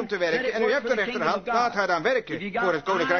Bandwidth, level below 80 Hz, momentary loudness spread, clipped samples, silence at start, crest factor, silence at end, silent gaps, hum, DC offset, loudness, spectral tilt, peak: 6.6 kHz; -62 dBFS; 3 LU; under 0.1%; 0 s; 16 dB; 0 s; none; none; under 0.1%; -25 LUFS; -4.5 dB/octave; -8 dBFS